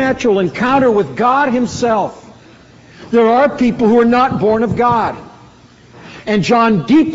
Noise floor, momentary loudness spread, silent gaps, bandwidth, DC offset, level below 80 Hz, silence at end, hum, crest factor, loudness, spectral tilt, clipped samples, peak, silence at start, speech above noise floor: -42 dBFS; 7 LU; none; 8 kHz; under 0.1%; -44 dBFS; 0 s; none; 12 dB; -13 LUFS; -5 dB/octave; under 0.1%; -2 dBFS; 0 s; 30 dB